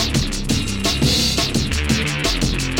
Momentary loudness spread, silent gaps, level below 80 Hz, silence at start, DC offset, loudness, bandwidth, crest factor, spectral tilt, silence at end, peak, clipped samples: 5 LU; none; -26 dBFS; 0 s; 0.8%; -18 LUFS; 17.5 kHz; 14 dB; -3.5 dB/octave; 0 s; -4 dBFS; under 0.1%